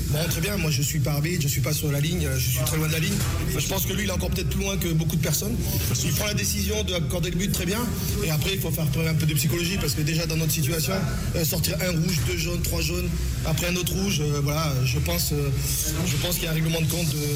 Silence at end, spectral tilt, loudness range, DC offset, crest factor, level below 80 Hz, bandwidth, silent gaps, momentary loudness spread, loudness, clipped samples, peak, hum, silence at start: 0 s; -4.5 dB/octave; 1 LU; under 0.1%; 12 dB; -34 dBFS; 17 kHz; none; 2 LU; -24 LUFS; under 0.1%; -12 dBFS; none; 0 s